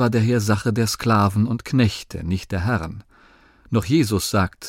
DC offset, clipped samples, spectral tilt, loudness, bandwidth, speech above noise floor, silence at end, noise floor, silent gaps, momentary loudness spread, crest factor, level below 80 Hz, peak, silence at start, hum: under 0.1%; under 0.1%; -6 dB/octave; -21 LUFS; 16.5 kHz; 32 dB; 0 s; -52 dBFS; none; 8 LU; 14 dB; -44 dBFS; -6 dBFS; 0 s; none